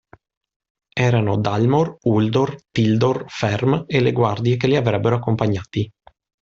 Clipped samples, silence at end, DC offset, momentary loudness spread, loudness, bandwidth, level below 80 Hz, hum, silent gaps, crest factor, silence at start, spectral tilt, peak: under 0.1%; 0.55 s; under 0.1%; 5 LU; -19 LUFS; 7.4 kHz; -52 dBFS; none; none; 16 dB; 0.95 s; -7.5 dB/octave; -4 dBFS